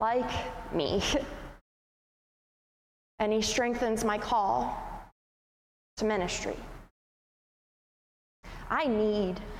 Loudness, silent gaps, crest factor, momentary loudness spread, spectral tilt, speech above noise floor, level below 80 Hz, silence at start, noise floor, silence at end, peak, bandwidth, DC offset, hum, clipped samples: -30 LUFS; 1.61-3.18 s, 5.12-5.97 s, 6.91-8.43 s; 16 dB; 19 LU; -4 dB/octave; over 60 dB; -50 dBFS; 0 s; under -90 dBFS; 0 s; -16 dBFS; 16 kHz; under 0.1%; none; under 0.1%